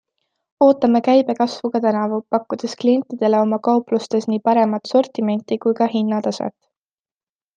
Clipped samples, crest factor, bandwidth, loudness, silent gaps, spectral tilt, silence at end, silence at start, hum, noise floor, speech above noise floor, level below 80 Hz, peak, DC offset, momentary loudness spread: under 0.1%; 16 dB; 9 kHz; -18 LUFS; none; -6.5 dB/octave; 1.05 s; 0.6 s; none; under -90 dBFS; over 72 dB; -70 dBFS; -2 dBFS; under 0.1%; 7 LU